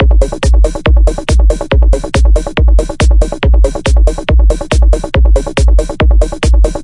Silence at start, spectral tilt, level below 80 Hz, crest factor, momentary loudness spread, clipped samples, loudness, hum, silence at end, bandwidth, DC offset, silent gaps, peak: 0 s; -6 dB/octave; -8 dBFS; 8 dB; 1 LU; under 0.1%; -11 LUFS; none; 0 s; 11 kHz; under 0.1%; none; 0 dBFS